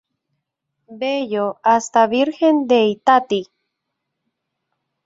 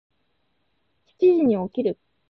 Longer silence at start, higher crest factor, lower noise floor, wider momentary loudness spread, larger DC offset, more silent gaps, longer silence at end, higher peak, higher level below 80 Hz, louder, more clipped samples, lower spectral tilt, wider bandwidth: second, 0.9 s vs 1.2 s; about the same, 18 dB vs 16 dB; first, -78 dBFS vs -72 dBFS; about the same, 9 LU vs 9 LU; neither; neither; first, 1.65 s vs 0.35 s; first, -2 dBFS vs -8 dBFS; about the same, -66 dBFS vs -64 dBFS; first, -17 LUFS vs -21 LUFS; neither; second, -4.5 dB/octave vs -10 dB/octave; first, 8 kHz vs 4.7 kHz